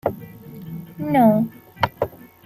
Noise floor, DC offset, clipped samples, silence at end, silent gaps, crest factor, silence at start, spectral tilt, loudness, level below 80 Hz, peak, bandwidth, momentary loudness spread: -38 dBFS; under 0.1%; under 0.1%; 0.4 s; none; 20 dB; 0.05 s; -8 dB/octave; -21 LUFS; -56 dBFS; -2 dBFS; 15.5 kHz; 22 LU